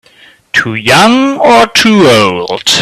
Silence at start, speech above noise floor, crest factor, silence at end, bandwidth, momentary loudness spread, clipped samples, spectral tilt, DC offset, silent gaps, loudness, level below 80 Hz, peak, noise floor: 0.55 s; 34 dB; 8 dB; 0 s; 17 kHz; 7 LU; 0.6%; -3.5 dB/octave; under 0.1%; none; -7 LUFS; -44 dBFS; 0 dBFS; -41 dBFS